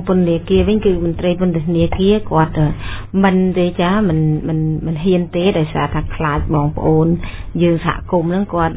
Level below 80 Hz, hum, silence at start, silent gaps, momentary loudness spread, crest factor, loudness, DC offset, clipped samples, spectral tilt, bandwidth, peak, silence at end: -30 dBFS; none; 0 s; none; 5 LU; 14 dB; -16 LUFS; under 0.1%; under 0.1%; -12 dB/octave; 4 kHz; 0 dBFS; 0 s